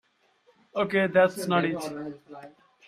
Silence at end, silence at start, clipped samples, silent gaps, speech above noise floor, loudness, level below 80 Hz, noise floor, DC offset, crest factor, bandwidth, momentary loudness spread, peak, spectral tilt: 0.4 s; 0.75 s; under 0.1%; none; 39 dB; -26 LUFS; -70 dBFS; -65 dBFS; under 0.1%; 20 dB; 15 kHz; 22 LU; -8 dBFS; -5.5 dB/octave